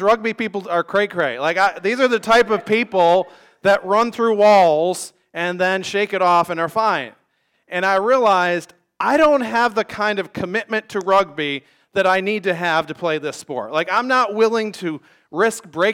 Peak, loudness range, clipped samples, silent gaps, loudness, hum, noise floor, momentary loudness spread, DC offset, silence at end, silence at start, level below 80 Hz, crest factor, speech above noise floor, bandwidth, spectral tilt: -6 dBFS; 4 LU; under 0.1%; none; -18 LUFS; none; -65 dBFS; 10 LU; under 0.1%; 0 s; 0 s; -58 dBFS; 12 dB; 48 dB; 16.5 kHz; -4.5 dB/octave